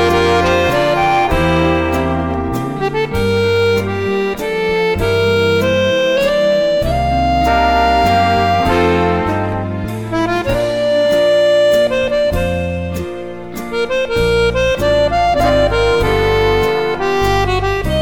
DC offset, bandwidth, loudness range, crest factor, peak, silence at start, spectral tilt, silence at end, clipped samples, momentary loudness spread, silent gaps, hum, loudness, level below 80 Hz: 0.7%; 18 kHz; 3 LU; 10 dB; -4 dBFS; 0 s; -5.5 dB/octave; 0 s; under 0.1%; 7 LU; none; none; -14 LUFS; -28 dBFS